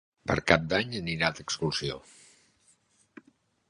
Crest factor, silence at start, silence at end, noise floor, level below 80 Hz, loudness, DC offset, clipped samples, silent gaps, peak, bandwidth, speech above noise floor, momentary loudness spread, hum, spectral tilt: 28 dB; 0.25 s; 1.7 s; -66 dBFS; -52 dBFS; -28 LUFS; under 0.1%; under 0.1%; none; -4 dBFS; 11 kHz; 38 dB; 9 LU; none; -4.5 dB/octave